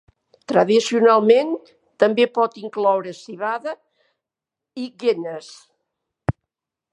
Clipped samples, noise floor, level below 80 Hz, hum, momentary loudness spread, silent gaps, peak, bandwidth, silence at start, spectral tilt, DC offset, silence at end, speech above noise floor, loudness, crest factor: under 0.1%; -86 dBFS; -52 dBFS; none; 18 LU; none; -2 dBFS; 11 kHz; 0.5 s; -5.5 dB/octave; under 0.1%; 0.6 s; 68 dB; -19 LUFS; 20 dB